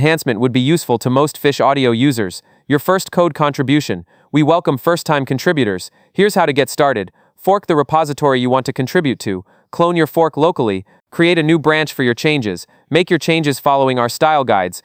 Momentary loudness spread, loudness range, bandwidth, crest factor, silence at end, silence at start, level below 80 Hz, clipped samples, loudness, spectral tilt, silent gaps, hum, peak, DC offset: 9 LU; 1 LU; 16.5 kHz; 14 dB; 0.05 s; 0 s; -56 dBFS; under 0.1%; -15 LUFS; -5.5 dB/octave; none; none; 0 dBFS; under 0.1%